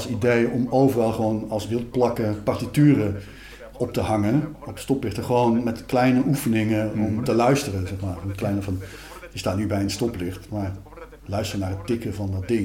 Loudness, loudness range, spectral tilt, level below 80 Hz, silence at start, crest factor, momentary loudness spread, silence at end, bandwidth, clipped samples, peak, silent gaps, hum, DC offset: -23 LUFS; 6 LU; -6.5 dB/octave; -48 dBFS; 0 s; 16 dB; 13 LU; 0 s; 17 kHz; under 0.1%; -6 dBFS; none; none; under 0.1%